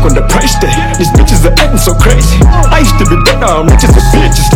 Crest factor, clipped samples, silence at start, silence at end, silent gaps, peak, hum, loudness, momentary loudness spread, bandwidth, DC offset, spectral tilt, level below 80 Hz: 6 dB; 10%; 0 s; 0 s; none; 0 dBFS; none; -7 LUFS; 3 LU; 17 kHz; under 0.1%; -5 dB/octave; -8 dBFS